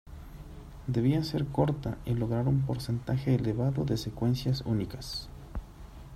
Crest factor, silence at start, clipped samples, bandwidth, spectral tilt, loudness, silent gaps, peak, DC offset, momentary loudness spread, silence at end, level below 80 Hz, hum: 18 dB; 0.05 s; under 0.1%; 14 kHz; -7.5 dB/octave; -30 LUFS; none; -12 dBFS; under 0.1%; 20 LU; 0 s; -46 dBFS; none